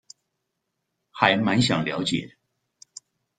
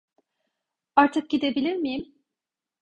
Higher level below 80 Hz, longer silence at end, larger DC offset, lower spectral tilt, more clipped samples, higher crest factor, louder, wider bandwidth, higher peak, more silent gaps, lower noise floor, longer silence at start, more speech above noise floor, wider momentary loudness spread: about the same, -60 dBFS vs -64 dBFS; first, 1.1 s vs 0.8 s; neither; about the same, -4.5 dB/octave vs -5 dB/octave; neither; about the same, 26 dB vs 22 dB; about the same, -22 LUFS vs -24 LUFS; about the same, 9.4 kHz vs 8.6 kHz; first, 0 dBFS vs -4 dBFS; neither; second, -80 dBFS vs -88 dBFS; first, 1.15 s vs 0.95 s; second, 57 dB vs 65 dB; first, 24 LU vs 9 LU